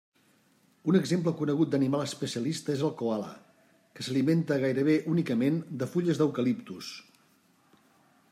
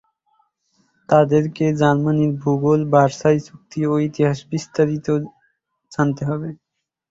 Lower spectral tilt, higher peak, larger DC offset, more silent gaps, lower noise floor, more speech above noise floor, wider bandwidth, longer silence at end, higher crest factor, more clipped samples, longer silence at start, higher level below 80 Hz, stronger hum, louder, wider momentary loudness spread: about the same, -6.5 dB/octave vs -7.5 dB/octave; second, -12 dBFS vs -2 dBFS; neither; neither; about the same, -66 dBFS vs -66 dBFS; second, 38 dB vs 49 dB; first, 14.5 kHz vs 7.8 kHz; first, 1.3 s vs 0.55 s; about the same, 18 dB vs 18 dB; neither; second, 0.85 s vs 1.1 s; second, -74 dBFS vs -56 dBFS; neither; second, -29 LUFS vs -19 LUFS; about the same, 10 LU vs 10 LU